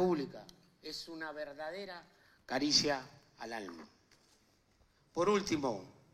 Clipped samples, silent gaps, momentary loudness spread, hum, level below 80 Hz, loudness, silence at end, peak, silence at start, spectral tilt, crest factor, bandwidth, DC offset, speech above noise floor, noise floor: under 0.1%; none; 21 LU; none; -70 dBFS; -36 LUFS; 0.2 s; -16 dBFS; 0 s; -3.5 dB/octave; 22 dB; 14.5 kHz; under 0.1%; 34 dB; -71 dBFS